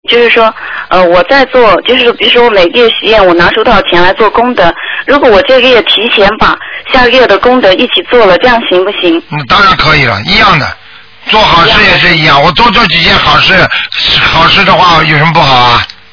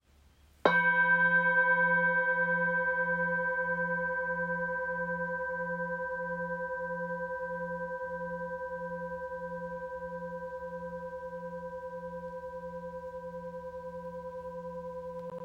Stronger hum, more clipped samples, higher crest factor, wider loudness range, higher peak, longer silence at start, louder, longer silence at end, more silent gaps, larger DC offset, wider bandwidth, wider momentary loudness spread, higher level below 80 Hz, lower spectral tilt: neither; first, 9% vs under 0.1%; second, 6 dB vs 24 dB; second, 2 LU vs 15 LU; first, 0 dBFS vs -10 dBFS; second, 0.1 s vs 0.65 s; first, -4 LUFS vs -32 LUFS; first, 0.25 s vs 0 s; neither; first, 2% vs under 0.1%; second, 5.4 kHz vs 7.8 kHz; second, 5 LU vs 17 LU; first, -26 dBFS vs -62 dBFS; second, -5 dB/octave vs -7 dB/octave